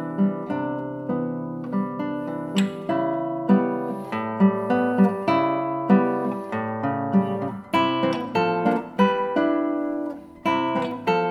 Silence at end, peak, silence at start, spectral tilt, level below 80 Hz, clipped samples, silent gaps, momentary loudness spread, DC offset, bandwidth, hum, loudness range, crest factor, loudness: 0 s; -4 dBFS; 0 s; -7.5 dB/octave; -64 dBFS; under 0.1%; none; 9 LU; under 0.1%; 11 kHz; none; 4 LU; 18 dB; -24 LUFS